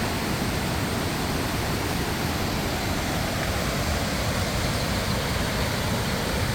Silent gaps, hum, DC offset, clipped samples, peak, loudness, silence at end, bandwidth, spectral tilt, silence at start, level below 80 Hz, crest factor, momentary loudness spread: none; none; under 0.1%; under 0.1%; -12 dBFS; -26 LUFS; 0 s; over 20 kHz; -4.5 dB/octave; 0 s; -36 dBFS; 14 dB; 1 LU